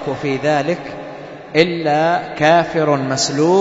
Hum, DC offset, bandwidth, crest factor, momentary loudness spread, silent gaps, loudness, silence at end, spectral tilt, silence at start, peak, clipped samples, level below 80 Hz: none; under 0.1%; 8 kHz; 16 dB; 15 LU; none; -16 LUFS; 0 s; -4.5 dB/octave; 0 s; 0 dBFS; under 0.1%; -54 dBFS